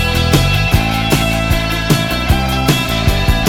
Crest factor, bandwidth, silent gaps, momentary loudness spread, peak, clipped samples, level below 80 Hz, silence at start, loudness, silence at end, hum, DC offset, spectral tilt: 12 dB; 18.5 kHz; none; 2 LU; 0 dBFS; under 0.1%; -20 dBFS; 0 s; -14 LUFS; 0 s; none; under 0.1%; -4.5 dB/octave